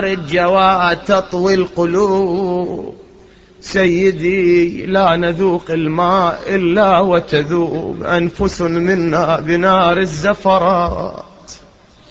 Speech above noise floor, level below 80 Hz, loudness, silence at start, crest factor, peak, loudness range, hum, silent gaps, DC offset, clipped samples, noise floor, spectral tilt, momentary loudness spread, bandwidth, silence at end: 31 dB; -40 dBFS; -14 LUFS; 0 s; 14 dB; 0 dBFS; 2 LU; none; none; under 0.1%; under 0.1%; -45 dBFS; -6.5 dB/octave; 8 LU; 7.8 kHz; 0.55 s